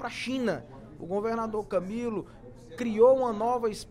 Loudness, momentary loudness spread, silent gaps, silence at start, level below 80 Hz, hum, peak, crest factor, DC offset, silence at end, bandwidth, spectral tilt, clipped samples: -28 LUFS; 20 LU; none; 0 s; -56 dBFS; none; -10 dBFS; 18 dB; under 0.1%; 0 s; 12 kHz; -6 dB/octave; under 0.1%